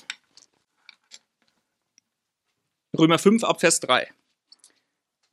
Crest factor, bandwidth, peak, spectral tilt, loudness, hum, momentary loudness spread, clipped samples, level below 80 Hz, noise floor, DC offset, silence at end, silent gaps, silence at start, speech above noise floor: 24 dB; 14.5 kHz; -2 dBFS; -3.5 dB/octave; -20 LUFS; none; 20 LU; under 0.1%; -76 dBFS; -80 dBFS; under 0.1%; 1.3 s; none; 0.1 s; 61 dB